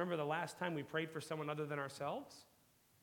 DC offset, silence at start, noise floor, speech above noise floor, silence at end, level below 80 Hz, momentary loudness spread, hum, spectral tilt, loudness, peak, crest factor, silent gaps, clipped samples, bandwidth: under 0.1%; 0 s; -72 dBFS; 30 dB; 0.6 s; -86 dBFS; 8 LU; none; -5.5 dB/octave; -43 LUFS; -24 dBFS; 20 dB; none; under 0.1%; 18 kHz